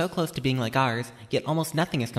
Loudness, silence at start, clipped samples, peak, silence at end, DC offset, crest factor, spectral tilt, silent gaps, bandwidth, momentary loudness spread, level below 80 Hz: -27 LUFS; 0 s; under 0.1%; -10 dBFS; 0 s; under 0.1%; 16 dB; -5.5 dB/octave; none; 15.5 kHz; 5 LU; -56 dBFS